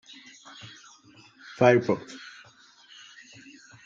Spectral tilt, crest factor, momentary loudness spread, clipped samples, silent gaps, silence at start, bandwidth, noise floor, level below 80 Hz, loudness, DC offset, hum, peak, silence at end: -6 dB/octave; 24 dB; 28 LU; under 0.1%; none; 0.65 s; 7.6 kHz; -55 dBFS; -74 dBFS; -23 LUFS; under 0.1%; none; -6 dBFS; 1.7 s